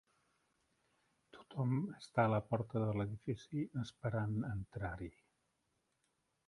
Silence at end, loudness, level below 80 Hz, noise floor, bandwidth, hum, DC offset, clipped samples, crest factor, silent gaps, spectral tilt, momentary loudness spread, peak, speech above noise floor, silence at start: 1.4 s; -40 LUFS; -64 dBFS; -83 dBFS; 11 kHz; none; under 0.1%; under 0.1%; 24 dB; none; -8.5 dB/octave; 10 LU; -18 dBFS; 44 dB; 1.35 s